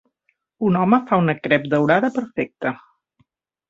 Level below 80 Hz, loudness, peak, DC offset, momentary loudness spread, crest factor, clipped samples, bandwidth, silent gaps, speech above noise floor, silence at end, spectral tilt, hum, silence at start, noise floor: -60 dBFS; -19 LUFS; -2 dBFS; under 0.1%; 10 LU; 20 dB; under 0.1%; 7.6 kHz; none; 51 dB; 0.95 s; -8 dB/octave; none; 0.6 s; -70 dBFS